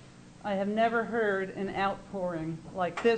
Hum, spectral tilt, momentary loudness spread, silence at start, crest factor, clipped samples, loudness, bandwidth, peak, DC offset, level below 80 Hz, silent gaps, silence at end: none; -6.5 dB/octave; 8 LU; 0 s; 16 dB; under 0.1%; -31 LUFS; 9.2 kHz; -14 dBFS; under 0.1%; -60 dBFS; none; 0 s